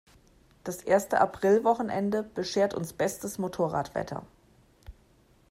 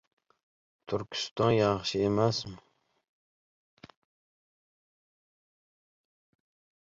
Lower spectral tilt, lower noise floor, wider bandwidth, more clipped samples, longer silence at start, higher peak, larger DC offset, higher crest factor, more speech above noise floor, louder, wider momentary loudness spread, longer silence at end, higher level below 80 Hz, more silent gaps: about the same, -5 dB/octave vs -5.5 dB/octave; second, -62 dBFS vs under -90 dBFS; first, 16 kHz vs 7.8 kHz; neither; second, 0.65 s vs 0.9 s; about the same, -10 dBFS vs -12 dBFS; neither; about the same, 20 dB vs 22 dB; second, 34 dB vs over 62 dB; about the same, -28 LUFS vs -29 LUFS; first, 14 LU vs 11 LU; second, 0.6 s vs 4.25 s; about the same, -58 dBFS vs -62 dBFS; second, none vs 1.31-1.36 s